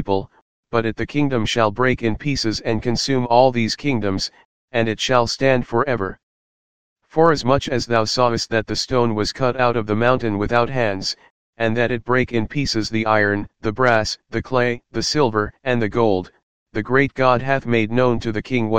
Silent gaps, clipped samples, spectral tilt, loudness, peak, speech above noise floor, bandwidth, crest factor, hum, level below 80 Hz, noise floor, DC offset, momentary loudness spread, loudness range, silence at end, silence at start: 0.42-0.63 s, 4.45-4.68 s, 6.23-6.96 s, 11.31-11.53 s, 16.43-16.66 s; under 0.1%; -5 dB/octave; -19 LUFS; 0 dBFS; over 71 dB; 15.5 kHz; 18 dB; none; -42 dBFS; under -90 dBFS; 2%; 7 LU; 2 LU; 0 s; 0 s